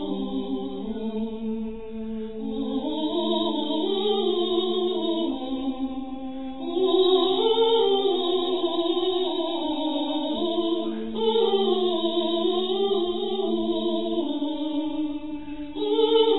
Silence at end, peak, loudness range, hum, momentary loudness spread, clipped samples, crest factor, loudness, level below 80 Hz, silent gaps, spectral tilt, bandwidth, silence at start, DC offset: 0 s; -8 dBFS; 5 LU; none; 11 LU; under 0.1%; 16 dB; -25 LUFS; -54 dBFS; none; -8 dB/octave; 4.1 kHz; 0 s; 1%